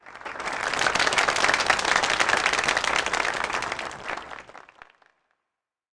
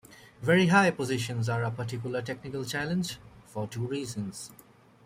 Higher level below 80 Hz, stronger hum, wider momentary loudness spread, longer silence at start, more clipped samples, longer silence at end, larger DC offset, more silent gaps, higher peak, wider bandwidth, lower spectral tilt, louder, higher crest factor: first, -54 dBFS vs -64 dBFS; neither; second, 13 LU vs 16 LU; about the same, 0.05 s vs 0.1 s; neither; first, 1.4 s vs 0.5 s; neither; neither; about the same, -8 dBFS vs -8 dBFS; second, 10.5 kHz vs 16 kHz; second, -1 dB/octave vs -5.5 dB/octave; first, -23 LUFS vs -29 LUFS; about the same, 18 dB vs 22 dB